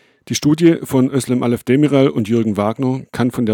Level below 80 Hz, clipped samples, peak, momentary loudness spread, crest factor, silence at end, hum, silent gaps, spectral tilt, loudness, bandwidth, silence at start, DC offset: -54 dBFS; under 0.1%; -2 dBFS; 7 LU; 14 dB; 0 s; none; none; -6.5 dB/octave; -16 LUFS; 18 kHz; 0.3 s; under 0.1%